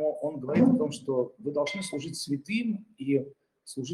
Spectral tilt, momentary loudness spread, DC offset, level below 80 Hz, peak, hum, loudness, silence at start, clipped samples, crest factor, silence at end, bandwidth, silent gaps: -6 dB/octave; 11 LU; under 0.1%; -72 dBFS; -10 dBFS; none; -29 LUFS; 0 s; under 0.1%; 20 dB; 0 s; 12.5 kHz; none